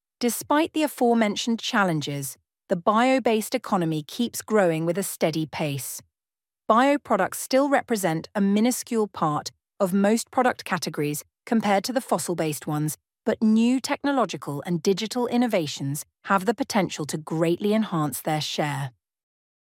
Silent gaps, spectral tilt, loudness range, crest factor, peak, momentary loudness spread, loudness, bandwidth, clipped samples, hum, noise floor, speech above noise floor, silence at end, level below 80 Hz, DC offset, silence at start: none; -5 dB/octave; 2 LU; 18 dB; -6 dBFS; 9 LU; -24 LUFS; 17 kHz; under 0.1%; none; under -90 dBFS; over 66 dB; 0.75 s; -72 dBFS; under 0.1%; 0.2 s